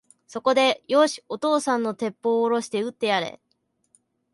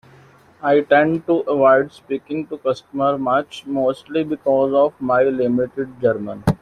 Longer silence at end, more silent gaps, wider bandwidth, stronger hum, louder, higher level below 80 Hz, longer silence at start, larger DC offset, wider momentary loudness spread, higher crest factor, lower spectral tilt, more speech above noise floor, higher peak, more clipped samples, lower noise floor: first, 1 s vs 0.05 s; neither; about the same, 11.5 kHz vs 12 kHz; neither; second, -23 LUFS vs -19 LUFS; second, -74 dBFS vs -50 dBFS; second, 0.3 s vs 0.6 s; neither; about the same, 8 LU vs 10 LU; about the same, 18 dB vs 16 dB; second, -3.5 dB/octave vs -7.5 dB/octave; first, 49 dB vs 30 dB; second, -6 dBFS vs -2 dBFS; neither; first, -72 dBFS vs -49 dBFS